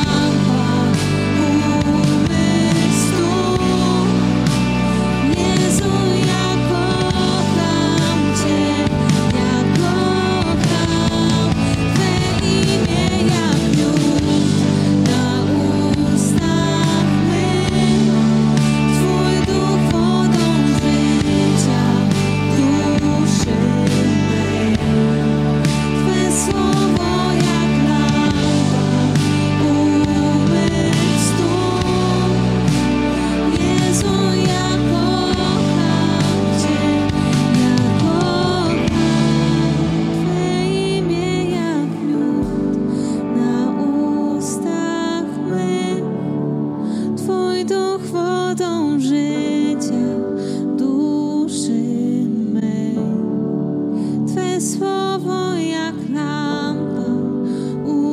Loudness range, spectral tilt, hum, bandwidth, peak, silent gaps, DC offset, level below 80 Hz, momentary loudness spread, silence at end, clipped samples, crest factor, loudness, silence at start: 4 LU; -6 dB/octave; none; 15 kHz; 0 dBFS; none; under 0.1%; -36 dBFS; 5 LU; 0 s; under 0.1%; 16 dB; -17 LUFS; 0 s